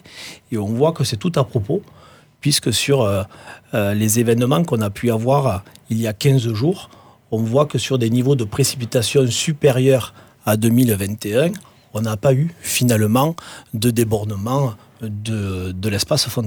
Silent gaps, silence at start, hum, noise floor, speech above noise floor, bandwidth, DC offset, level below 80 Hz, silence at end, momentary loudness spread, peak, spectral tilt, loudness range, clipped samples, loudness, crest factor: none; 0.1 s; none; -38 dBFS; 20 dB; over 20 kHz; under 0.1%; -52 dBFS; 0 s; 10 LU; -2 dBFS; -5.5 dB/octave; 2 LU; under 0.1%; -19 LUFS; 16 dB